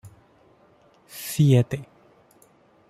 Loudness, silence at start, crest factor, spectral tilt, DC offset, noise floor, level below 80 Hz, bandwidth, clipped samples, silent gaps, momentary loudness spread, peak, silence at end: -22 LUFS; 0.05 s; 20 dB; -7 dB/octave; under 0.1%; -58 dBFS; -60 dBFS; 16 kHz; under 0.1%; none; 18 LU; -8 dBFS; 1.05 s